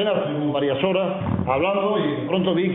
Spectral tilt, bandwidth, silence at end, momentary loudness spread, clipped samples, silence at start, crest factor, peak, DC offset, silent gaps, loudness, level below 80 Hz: -11 dB/octave; 3.9 kHz; 0 s; 3 LU; under 0.1%; 0 s; 14 dB; -6 dBFS; under 0.1%; none; -22 LUFS; -52 dBFS